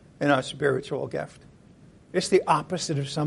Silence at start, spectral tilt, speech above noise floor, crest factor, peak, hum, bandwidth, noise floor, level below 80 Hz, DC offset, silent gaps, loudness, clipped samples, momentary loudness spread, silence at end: 0.2 s; -5 dB/octave; 27 dB; 20 dB; -8 dBFS; none; 11.5 kHz; -53 dBFS; -60 dBFS; under 0.1%; none; -26 LUFS; under 0.1%; 10 LU; 0 s